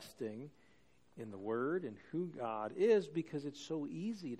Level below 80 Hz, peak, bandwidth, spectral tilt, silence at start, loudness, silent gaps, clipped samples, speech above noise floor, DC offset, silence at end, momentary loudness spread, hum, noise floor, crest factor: -80 dBFS; -20 dBFS; 13.5 kHz; -6.5 dB/octave; 0 s; -39 LUFS; none; under 0.1%; 32 dB; under 0.1%; 0 s; 16 LU; none; -71 dBFS; 18 dB